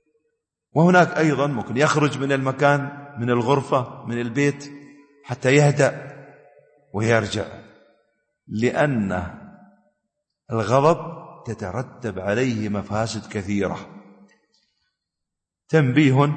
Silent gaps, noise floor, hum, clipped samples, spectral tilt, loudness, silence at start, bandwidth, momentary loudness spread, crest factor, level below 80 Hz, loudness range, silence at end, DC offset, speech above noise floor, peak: none; -84 dBFS; none; under 0.1%; -6.5 dB/octave; -21 LUFS; 0.75 s; 8.8 kHz; 17 LU; 18 dB; -58 dBFS; 7 LU; 0 s; under 0.1%; 63 dB; -4 dBFS